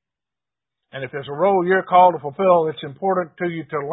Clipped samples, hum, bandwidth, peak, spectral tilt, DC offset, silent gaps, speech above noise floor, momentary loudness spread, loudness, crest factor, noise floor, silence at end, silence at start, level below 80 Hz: under 0.1%; none; 4 kHz; -2 dBFS; -11 dB/octave; under 0.1%; none; 70 dB; 15 LU; -19 LUFS; 18 dB; -89 dBFS; 0 s; 0.95 s; -66 dBFS